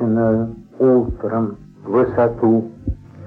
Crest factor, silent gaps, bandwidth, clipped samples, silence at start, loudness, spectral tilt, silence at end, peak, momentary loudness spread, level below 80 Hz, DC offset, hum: 12 dB; none; 3.7 kHz; under 0.1%; 0 s; -18 LUFS; -11.5 dB/octave; 0 s; -6 dBFS; 13 LU; -38 dBFS; under 0.1%; none